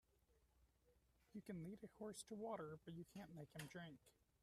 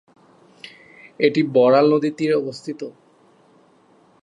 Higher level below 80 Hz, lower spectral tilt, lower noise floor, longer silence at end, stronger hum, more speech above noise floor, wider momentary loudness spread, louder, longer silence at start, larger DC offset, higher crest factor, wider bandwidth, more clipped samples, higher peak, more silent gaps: second, -82 dBFS vs -74 dBFS; second, -5.5 dB/octave vs -7 dB/octave; first, -80 dBFS vs -55 dBFS; second, 0.3 s vs 1.35 s; neither; second, 25 dB vs 37 dB; second, 9 LU vs 26 LU; second, -56 LUFS vs -18 LUFS; second, 0.3 s vs 0.65 s; neither; about the same, 18 dB vs 18 dB; first, 14 kHz vs 10 kHz; neither; second, -38 dBFS vs -2 dBFS; neither